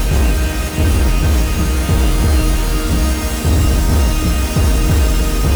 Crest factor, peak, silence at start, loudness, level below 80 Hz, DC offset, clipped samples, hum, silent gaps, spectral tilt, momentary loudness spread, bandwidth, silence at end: 10 dB; -2 dBFS; 0 s; -16 LUFS; -14 dBFS; under 0.1%; under 0.1%; none; none; -5 dB/octave; 3 LU; over 20 kHz; 0 s